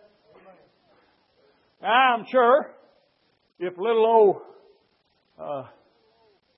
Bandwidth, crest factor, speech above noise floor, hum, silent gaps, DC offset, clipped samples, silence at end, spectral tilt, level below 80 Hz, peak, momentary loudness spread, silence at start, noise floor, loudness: 5.8 kHz; 20 dB; 47 dB; none; none; under 0.1%; under 0.1%; 0.95 s; -8.5 dB/octave; -82 dBFS; -6 dBFS; 17 LU; 1.85 s; -68 dBFS; -22 LUFS